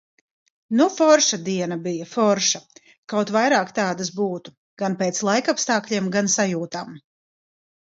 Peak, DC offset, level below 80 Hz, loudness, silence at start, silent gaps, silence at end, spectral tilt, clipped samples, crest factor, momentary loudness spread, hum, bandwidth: -2 dBFS; under 0.1%; -70 dBFS; -21 LUFS; 0.7 s; 2.98-3.03 s, 4.57-4.77 s; 0.95 s; -3.5 dB/octave; under 0.1%; 20 dB; 11 LU; none; 7.8 kHz